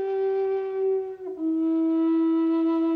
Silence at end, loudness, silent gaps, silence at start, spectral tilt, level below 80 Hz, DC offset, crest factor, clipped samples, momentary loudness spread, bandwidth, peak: 0 s; -25 LUFS; none; 0 s; -7.5 dB/octave; -72 dBFS; under 0.1%; 6 dB; under 0.1%; 6 LU; 4.5 kHz; -18 dBFS